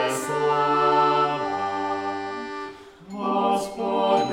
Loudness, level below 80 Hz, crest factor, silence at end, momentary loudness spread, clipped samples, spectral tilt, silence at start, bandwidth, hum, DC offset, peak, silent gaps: -23 LUFS; -62 dBFS; 16 dB; 0 s; 13 LU; under 0.1%; -4.5 dB/octave; 0 s; 16 kHz; none; under 0.1%; -8 dBFS; none